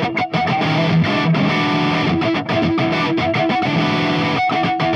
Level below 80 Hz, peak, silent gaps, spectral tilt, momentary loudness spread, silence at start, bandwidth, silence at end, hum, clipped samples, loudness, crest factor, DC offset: -52 dBFS; -4 dBFS; none; -6.5 dB/octave; 2 LU; 0 s; 7.6 kHz; 0 s; none; under 0.1%; -17 LUFS; 12 dB; under 0.1%